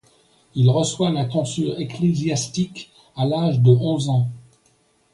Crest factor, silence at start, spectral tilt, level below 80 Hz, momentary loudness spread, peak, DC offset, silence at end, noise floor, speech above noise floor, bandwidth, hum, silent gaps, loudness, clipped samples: 18 dB; 0.55 s; -6.5 dB/octave; -58 dBFS; 12 LU; -4 dBFS; under 0.1%; 0.75 s; -61 dBFS; 42 dB; 11.5 kHz; none; none; -20 LUFS; under 0.1%